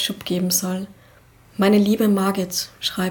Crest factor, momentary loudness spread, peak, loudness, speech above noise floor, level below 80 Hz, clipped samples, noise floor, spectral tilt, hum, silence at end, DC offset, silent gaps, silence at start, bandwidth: 16 dB; 12 LU; -6 dBFS; -20 LUFS; 31 dB; -56 dBFS; under 0.1%; -51 dBFS; -4.5 dB/octave; none; 0 s; under 0.1%; none; 0 s; 19.5 kHz